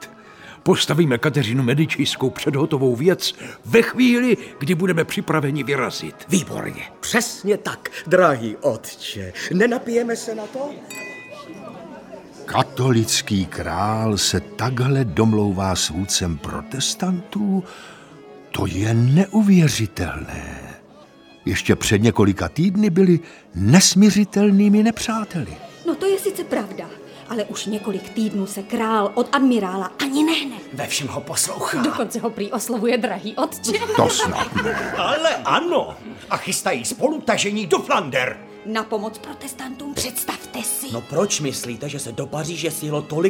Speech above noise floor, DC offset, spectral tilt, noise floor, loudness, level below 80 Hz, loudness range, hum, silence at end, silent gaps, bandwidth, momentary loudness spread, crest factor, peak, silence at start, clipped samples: 27 dB; under 0.1%; -4.5 dB/octave; -47 dBFS; -20 LUFS; -48 dBFS; 8 LU; none; 0 s; none; 18.5 kHz; 14 LU; 20 dB; 0 dBFS; 0 s; under 0.1%